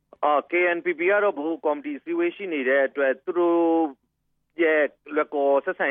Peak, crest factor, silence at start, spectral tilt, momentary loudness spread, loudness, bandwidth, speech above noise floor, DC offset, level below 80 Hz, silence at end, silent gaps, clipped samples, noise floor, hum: -8 dBFS; 14 dB; 0.2 s; -8 dB/octave; 6 LU; -23 LUFS; 3.7 kHz; 50 dB; under 0.1%; -80 dBFS; 0 s; none; under 0.1%; -73 dBFS; none